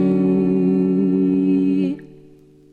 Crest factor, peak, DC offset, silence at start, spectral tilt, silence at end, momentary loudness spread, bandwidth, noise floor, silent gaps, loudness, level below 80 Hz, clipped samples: 10 dB; -8 dBFS; under 0.1%; 0 s; -11 dB/octave; 0.55 s; 5 LU; 4.4 kHz; -47 dBFS; none; -18 LUFS; -56 dBFS; under 0.1%